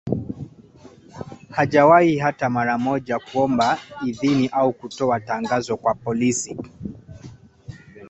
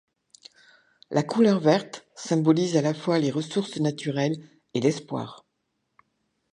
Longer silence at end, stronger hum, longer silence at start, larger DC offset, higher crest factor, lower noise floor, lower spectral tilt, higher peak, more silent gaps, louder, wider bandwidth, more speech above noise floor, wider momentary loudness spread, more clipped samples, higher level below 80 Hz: second, 0.05 s vs 1.2 s; neither; second, 0.05 s vs 1.1 s; neither; about the same, 20 dB vs 20 dB; second, -47 dBFS vs -77 dBFS; about the same, -5.5 dB/octave vs -6 dB/octave; first, -2 dBFS vs -6 dBFS; neither; first, -20 LUFS vs -25 LUFS; second, 8.4 kHz vs 10.5 kHz; second, 27 dB vs 53 dB; first, 22 LU vs 13 LU; neither; first, -52 dBFS vs -72 dBFS